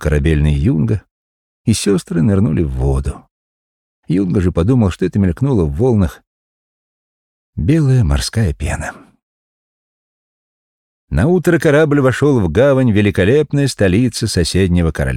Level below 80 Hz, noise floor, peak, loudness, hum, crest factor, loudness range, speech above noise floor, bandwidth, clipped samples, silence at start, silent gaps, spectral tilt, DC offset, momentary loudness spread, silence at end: -28 dBFS; under -90 dBFS; -2 dBFS; -14 LUFS; none; 14 dB; 6 LU; over 77 dB; 15.5 kHz; under 0.1%; 0 s; 1.11-1.65 s, 3.31-4.03 s, 6.27-7.53 s, 9.23-11.08 s; -6.5 dB/octave; under 0.1%; 9 LU; 0 s